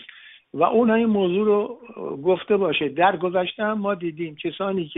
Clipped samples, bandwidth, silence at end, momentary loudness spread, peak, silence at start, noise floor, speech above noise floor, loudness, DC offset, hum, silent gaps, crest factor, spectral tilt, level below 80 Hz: under 0.1%; 4 kHz; 0 s; 11 LU; -4 dBFS; 0 s; -47 dBFS; 25 dB; -22 LUFS; under 0.1%; none; none; 18 dB; -4 dB/octave; -64 dBFS